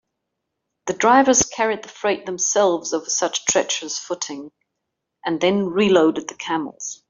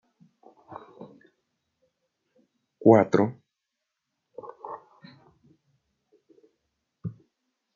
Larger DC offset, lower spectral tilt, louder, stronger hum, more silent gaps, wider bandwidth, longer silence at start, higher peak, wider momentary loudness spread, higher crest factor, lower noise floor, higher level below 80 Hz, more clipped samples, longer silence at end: neither; second, -2.5 dB/octave vs -8 dB/octave; about the same, -20 LUFS vs -21 LUFS; neither; neither; about the same, 7.8 kHz vs 7.2 kHz; first, 0.85 s vs 0.7 s; about the same, -2 dBFS vs -4 dBFS; second, 13 LU vs 29 LU; second, 18 dB vs 26 dB; second, -79 dBFS vs -83 dBFS; first, -58 dBFS vs -76 dBFS; neither; second, 0.15 s vs 0.65 s